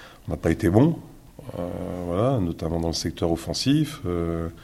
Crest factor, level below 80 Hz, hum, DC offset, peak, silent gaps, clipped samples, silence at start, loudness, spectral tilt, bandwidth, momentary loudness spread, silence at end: 22 dB; -46 dBFS; none; under 0.1%; -2 dBFS; none; under 0.1%; 0 s; -25 LUFS; -6.5 dB/octave; 15.5 kHz; 13 LU; 0 s